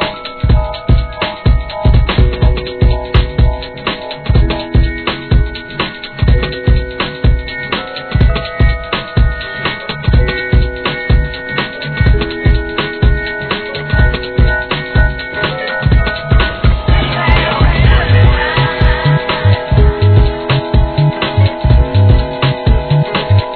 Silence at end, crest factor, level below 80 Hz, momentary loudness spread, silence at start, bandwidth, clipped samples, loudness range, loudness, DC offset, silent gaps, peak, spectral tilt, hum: 0 s; 12 dB; -14 dBFS; 7 LU; 0 s; 4.6 kHz; 0.2%; 4 LU; -13 LUFS; 0.2%; none; 0 dBFS; -9.5 dB/octave; none